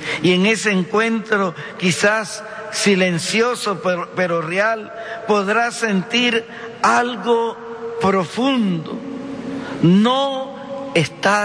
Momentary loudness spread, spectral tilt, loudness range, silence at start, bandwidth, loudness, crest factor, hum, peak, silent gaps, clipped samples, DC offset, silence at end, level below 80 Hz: 13 LU; -4.5 dB/octave; 2 LU; 0 s; 11 kHz; -18 LUFS; 16 dB; none; -4 dBFS; none; under 0.1%; under 0.1%; 0 s; -60 dBFS